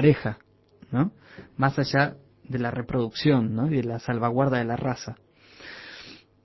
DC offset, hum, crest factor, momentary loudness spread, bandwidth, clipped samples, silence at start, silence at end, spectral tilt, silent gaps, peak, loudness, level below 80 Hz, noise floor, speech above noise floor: under 0.1%; none; 20 dB; 19 LU; 6.2 kHz; under 0.1%; 0 s; 0.3 s; -7.5 dB/octave; none; -6 dBFS; -26 LUFS; -54 dBFS; -47 dBFS; 22 dB